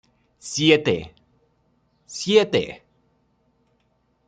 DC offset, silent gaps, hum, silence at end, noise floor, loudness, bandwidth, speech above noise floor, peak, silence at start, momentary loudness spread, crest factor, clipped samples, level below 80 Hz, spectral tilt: under 0.1%; none; none; 1.5 s; -67 dBFS; -20 LUFS; 9.4 kHz; 47 dB; -2 dBFS; 0.45 s; 23 LU; 24 dB; under 0.1%; -60 dBFS; -4 dB/octave